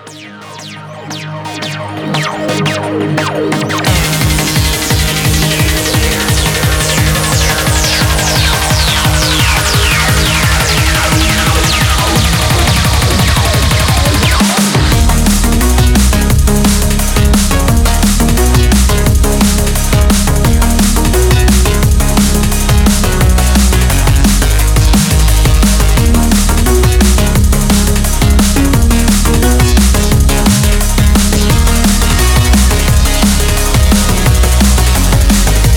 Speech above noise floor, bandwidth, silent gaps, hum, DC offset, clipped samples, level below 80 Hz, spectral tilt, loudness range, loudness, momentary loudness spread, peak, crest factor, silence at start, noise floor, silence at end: 16 dB; 19 kHz; none; none; under 0.1%; 0.1%; -12 dBFS; -4 dB/octave; 2 LU; -10 LUFS; 3 LU; 0 dBFS; 8 dB; 0 s; -29 dBFS; 0 s